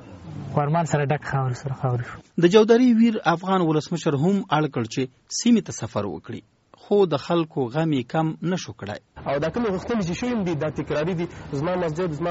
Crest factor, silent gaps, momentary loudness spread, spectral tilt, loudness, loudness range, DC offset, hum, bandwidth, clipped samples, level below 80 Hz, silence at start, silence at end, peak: 20 dB; none; 12 LU; -6 dB/octave; -23 LUFS; 6 LU; under 0.1%; none; 8 kHz; under 0.1%; -54 dBFS; 0 s; 0 s; -4 dBFS